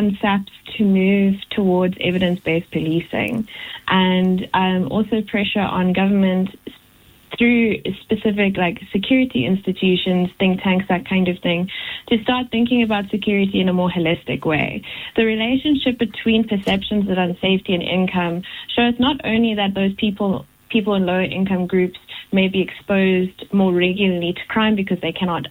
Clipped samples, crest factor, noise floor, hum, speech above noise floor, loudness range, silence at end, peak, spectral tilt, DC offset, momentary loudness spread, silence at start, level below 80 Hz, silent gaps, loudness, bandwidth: under 0.1%; 14 dB; -50 dBFS; none; 32 dB; 1 LU; 0 s; -4 dBFS; -7.5 dB/octave; under 0.1%; 6 LU; 0 s; -48 dBFS; none; -19 LUFS; 16 kHz